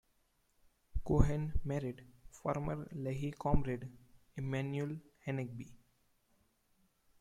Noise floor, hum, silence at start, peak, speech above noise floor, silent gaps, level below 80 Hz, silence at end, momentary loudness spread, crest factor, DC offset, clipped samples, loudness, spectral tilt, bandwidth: -76 dBFS; none; 0.95 s; -12 dBFS; 40 dB; none; -46 dBFS; 1.45 s; 15 LU; 26 dB; under 0.1%; under 0.1%; -39 LUFS; -8 dB/octave; 11 kHz